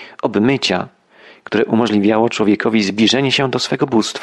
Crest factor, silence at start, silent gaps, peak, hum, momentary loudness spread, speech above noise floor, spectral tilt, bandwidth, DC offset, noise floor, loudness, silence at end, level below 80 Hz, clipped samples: 14 dB; 0 s; none; -2 dBFS; none; 6 LU; 30 dB; -5 dB/octave; 11.5 kHz; under 0.1%; -45 dBFS; -15 LUFS; 0 s; -56 dBFS; under 0.1%